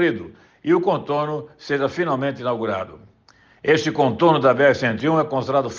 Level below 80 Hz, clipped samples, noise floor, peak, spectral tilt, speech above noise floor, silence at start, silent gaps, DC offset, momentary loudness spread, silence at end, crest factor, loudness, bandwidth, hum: -62 dBFS; under 0.1%; -54 dBFS; -4 dBFS; -6.5 dB/octave; 35 dB; 0 s; none; under 0.1%; 13 LU; 0 s; 18 dB; -20 LUFS; 7.2 kHz; none